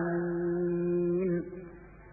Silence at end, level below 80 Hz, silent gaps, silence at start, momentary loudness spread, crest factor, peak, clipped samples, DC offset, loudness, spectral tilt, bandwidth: 0 s; -56 dBFS; none; 0 s; 15 LU; 10 dB; -22 dBFS; under 0.1%; under 0.1%; -31 LUFS; -14.5 dB/octave; 2.6 kHz